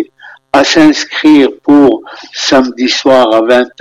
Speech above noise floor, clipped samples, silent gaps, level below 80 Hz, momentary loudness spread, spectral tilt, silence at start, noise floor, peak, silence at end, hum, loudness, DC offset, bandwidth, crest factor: 29 dB; 0.4%; none; -46 dBFS; 8 LU; -3.5 dB/octave; 0 s; -36 dBFS; 0 dBFS; 0.1 s; none; -8 LUFS; under 0.1%; 9.6 kHz; 8 dB